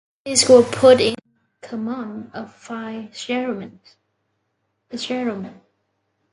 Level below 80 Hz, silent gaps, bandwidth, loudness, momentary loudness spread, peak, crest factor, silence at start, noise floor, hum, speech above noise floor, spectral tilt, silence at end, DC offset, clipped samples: -58 dBFS; none; 11.5 kHz; -18 LUFS; 22 LU; 0 dBFS; 20 dB; 0.25 s; -72 dBFS; none; 54 dB; -3 dB/octave; 0.8 s; under 0.1%; under 0.1%